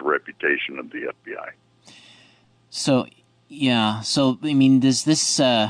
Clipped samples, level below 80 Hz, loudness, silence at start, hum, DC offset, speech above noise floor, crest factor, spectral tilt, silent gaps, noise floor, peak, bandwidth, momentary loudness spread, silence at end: under 0.1%; -66 dBFS; -20 LUFS; 0 s; none; under 0.1%; 36 dB; 14 dB; -4 dB/octave; none; -56 dBFS; -8 dBFS; 10 kHz; 17 LU; 0 s